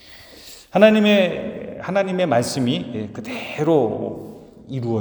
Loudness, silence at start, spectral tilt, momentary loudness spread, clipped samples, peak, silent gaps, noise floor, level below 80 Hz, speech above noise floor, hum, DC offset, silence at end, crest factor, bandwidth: -19 LUFS; 0.05 s; -5.5 dB/octave; 20 LU; under 0.1%; 0 dBFS; none; -43 dBFS; -58 dBFS; 24 dB; none; under 0.1%; 0 s; 20 dB; over 20 kHz